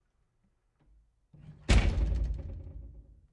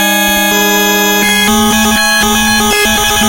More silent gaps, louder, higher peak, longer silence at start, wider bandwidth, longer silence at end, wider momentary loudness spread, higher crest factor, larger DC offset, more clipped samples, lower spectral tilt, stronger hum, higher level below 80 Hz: neither; second, -31 LUFS vs -8 LUFS; second, -12 dBFS vs 0 dBFS; first, 1.45 s vs 0 s; second, 11 kHz vs 17 kHz; first, 0.3 s vs 0 s; first, 22 LU vs 1 LU; first, 22 dB vs 10 dB; neither; second, under 0.1% vs 0.1%; first, -5.5 dB/octave vs -2 dB/octave; neither; about the same, -34 dBFS vs -30 dBFS